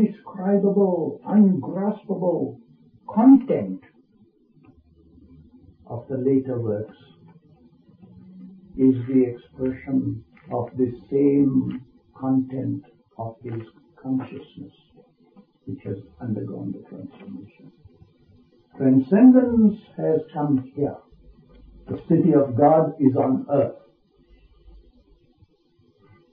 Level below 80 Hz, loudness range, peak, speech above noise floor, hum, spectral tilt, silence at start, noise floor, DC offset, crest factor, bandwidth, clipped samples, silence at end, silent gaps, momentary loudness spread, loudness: -58 dBFS; 14 LU; -4 dBFS; 41 dB; none; -13.5 dB/octave; 0 s; -61 dBFS; under 0.1%; 20 dB; 3.5 kHz; under 0.1%; 2.55 s; none; 20 LU; -21 LUFS